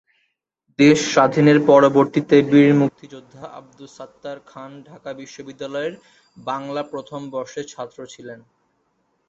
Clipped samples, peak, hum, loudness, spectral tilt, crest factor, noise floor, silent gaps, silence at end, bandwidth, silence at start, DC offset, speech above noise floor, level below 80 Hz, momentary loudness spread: under 0.1%; -2 dBFS; none; -17 LUFS; -6 dB/octave; 18 dB; -71 dBFS; none; 0.95 s; 8 kHz; 0.8 s; under 0.1%; 52 dB; -62 dBFS; 25 LU